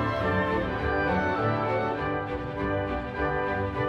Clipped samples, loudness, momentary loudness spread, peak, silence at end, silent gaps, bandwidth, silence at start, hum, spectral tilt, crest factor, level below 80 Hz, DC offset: under 0.1%; -28 LUFS; 5 LU; -14 dBFS; 0 s; none; 8.8 kHz; 0 s; none; -8 dB/octave; 14 dB; -42 dBFS; under 0.1%